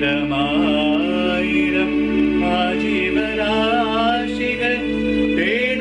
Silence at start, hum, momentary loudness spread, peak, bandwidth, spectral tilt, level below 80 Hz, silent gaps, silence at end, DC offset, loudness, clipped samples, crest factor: 0 s; none; 2 LU; -6 dBFS; 9.8 kHz; -6 dB/octave; -40 dBFS; none; 0 s; under 0.1%; -18 LUFS; under 0.1%; 12 dB